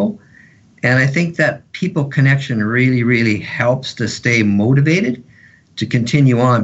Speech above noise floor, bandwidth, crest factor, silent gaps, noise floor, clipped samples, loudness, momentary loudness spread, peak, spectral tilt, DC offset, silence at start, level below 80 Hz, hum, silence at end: 32 dB; 8 kHz; 14 dB; none; -46 dBFS; under 0.1%; -15 LUFS; 9 LU; -2 dBFS; -6.5 dB/octave; under 0.1%; 0 s; -54 dBFS; none; 0 s